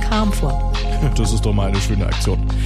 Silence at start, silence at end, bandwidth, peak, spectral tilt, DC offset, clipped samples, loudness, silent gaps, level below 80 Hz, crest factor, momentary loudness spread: 0 s; 0 s; 13.5 kHz; -4 dBFS; -5.5 dB/octave; under 0.1%; under 0.1%; -19 LUFS; none; -18 dBFS; 12 dB; 3 LU